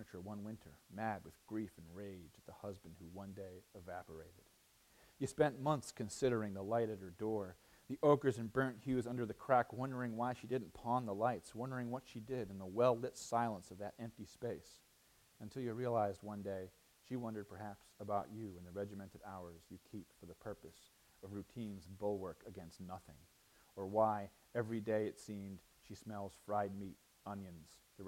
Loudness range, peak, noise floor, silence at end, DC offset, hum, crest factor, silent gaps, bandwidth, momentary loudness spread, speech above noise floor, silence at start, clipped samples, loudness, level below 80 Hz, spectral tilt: 11 LU; -18 dBFS; -71 dBFS; 0 s; under 0.1%; none; 24 dB; none; 16.5 kHz; 19 LU; 29 dB; 0 s; under 0.1%; -42 LUFS; -72 dBFS; -6.5 dB/octave